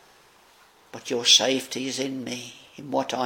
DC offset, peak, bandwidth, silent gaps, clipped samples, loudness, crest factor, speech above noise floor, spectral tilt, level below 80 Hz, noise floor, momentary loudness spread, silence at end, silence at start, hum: under 0.1%; -4 dBFS; 17 kHz; none; under 0.1%; -22 LUFS; 22 dB; 31 dB; -1.5 dB/octave; -74 dBFS; -56 dBFS; 24 LU; 0 s; 0.95 s; none